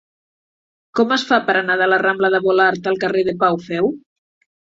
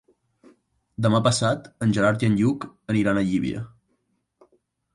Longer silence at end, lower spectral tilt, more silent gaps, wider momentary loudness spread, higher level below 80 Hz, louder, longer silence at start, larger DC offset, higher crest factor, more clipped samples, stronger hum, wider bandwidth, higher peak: second, 0.7 s vs 1.25 s; about the same, -5 dB/octave vs -6 dB/octave; neither; second, 6 LU vs 12 LU; second, -60 dBFS vs -54 dBFS; first, -17 LUFS vs -23 LUFS; about the same, 0.95 s vs 1 s; neither; about the same, 16 dB vs 16 dB; neither; neither; second, 7.8 kHz vs 11.5 kHz; first, -2 dBFS vs -8 dBFS